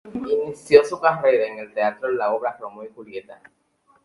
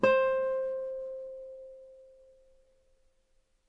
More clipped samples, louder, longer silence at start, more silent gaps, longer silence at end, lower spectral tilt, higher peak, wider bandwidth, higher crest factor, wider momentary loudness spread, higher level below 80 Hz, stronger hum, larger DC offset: neither; first, -20 LUFS vs -32 LUFS; about the same, 0.05 s vs 0 s; neither; second, 0.7 s vs 1.65 s; about the same, -5 dB/octave vs -6 dB/octave; first, 0 dBFS vs -10 dBFS; first, 11.5 kHz vs 7.4 kHz; about the same, 22 dB vs 22 dB; about the same, 21 LU vs 23 LU; about the same, -64 dBFS vs -68 dBFS; neither; neither